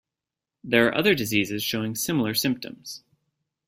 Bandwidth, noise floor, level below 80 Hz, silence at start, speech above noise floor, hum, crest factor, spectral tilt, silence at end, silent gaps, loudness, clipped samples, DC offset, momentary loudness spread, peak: 16.5 kHz; -88 dBFS; -62 dBFS; 0.65 s; 64 dB; none; 22 dB; -4 dB/octave; 0.7 s; none; -23 LUFS; under 0.1%; under 0.1%; 17 LU; -4 dBFS